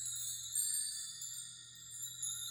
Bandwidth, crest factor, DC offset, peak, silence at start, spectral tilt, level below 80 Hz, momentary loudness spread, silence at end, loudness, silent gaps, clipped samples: over 20 kHz; 18 dB; under 0.1%; -24 dBFS; 0 s; 2.5 dB/octave; -80 dBFS; 13 LU; 0 s; -39 LUFS; none; under 0.1%